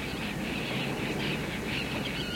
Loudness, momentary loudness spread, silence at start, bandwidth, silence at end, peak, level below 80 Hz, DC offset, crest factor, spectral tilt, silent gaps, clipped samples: -32 LUFS; 2 LU; 0 s; 16.5 kHz; 0 s; -20 dBFS; -48 dBFS; under 0.1%; 14 dB; -4.5 dB/octave; none; under 0.1%